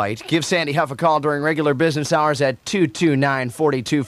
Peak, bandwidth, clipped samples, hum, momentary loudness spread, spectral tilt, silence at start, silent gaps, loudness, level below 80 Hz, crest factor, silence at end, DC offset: -4 dBFS; 14.5 kHz; under 0.1%; none; 3 LU; -5.5 dB/octave; 0 s; none; -19 LUFS; -58 dBFS; 14 dB; 0 s; under 0.1%